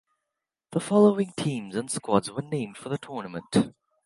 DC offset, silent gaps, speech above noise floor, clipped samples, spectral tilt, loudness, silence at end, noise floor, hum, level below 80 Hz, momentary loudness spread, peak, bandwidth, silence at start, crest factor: under 0.1%; none; 60 dB; under 0.1%; -6 dB/octave; -27 LUFS; 0.35 s; -85 dBFS; none; -64 dBFS; 13 LU; -6 dBFS; 11.5 kHz; 0.7 s; 22 dB